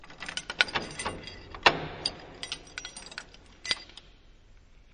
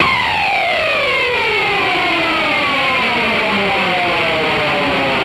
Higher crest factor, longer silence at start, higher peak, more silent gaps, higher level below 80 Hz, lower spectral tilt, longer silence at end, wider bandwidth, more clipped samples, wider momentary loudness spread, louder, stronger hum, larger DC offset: first, 30 dB vs 14 dB; about the same, 0 s vs 0 s; second, -4 dBFS vs 0 dBFS; neither; second, -54 dBFS vs -44 dBFS; second, -2 dB/octave vs -4 dB/octave; about the same, 0.1 s vs 0 s; second, 9.4 kHz vs 16 kHz; neither; first, 19 LU vs 1 LU; second, -31 LUFS vs -14 LUFS; neither; neither